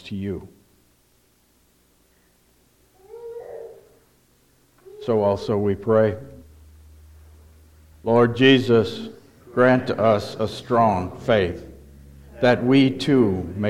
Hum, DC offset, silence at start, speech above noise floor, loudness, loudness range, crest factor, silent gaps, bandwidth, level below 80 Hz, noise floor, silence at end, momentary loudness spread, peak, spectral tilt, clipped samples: none; under 0.1%; 0.05 s; 42 dB; -20 LUFS; 9 LU; 18 dB; none; 13 kHz; -52 dBFS; -61 dBFS; 0 s; 20 LU; -4 dBFS; -7 dB/octave; under 0.1%